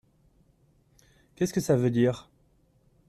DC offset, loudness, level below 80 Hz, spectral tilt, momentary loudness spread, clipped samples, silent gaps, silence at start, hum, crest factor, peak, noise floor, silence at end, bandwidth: under 0.1%; -26 LUFS; -62 dBFS; -6.5 dB/octave; 8 LU; under 0.1%; none; 1.4 s; none; 18 dB; -12 dBFS; -65 dBFS; 0.9 s; 14.5 kHz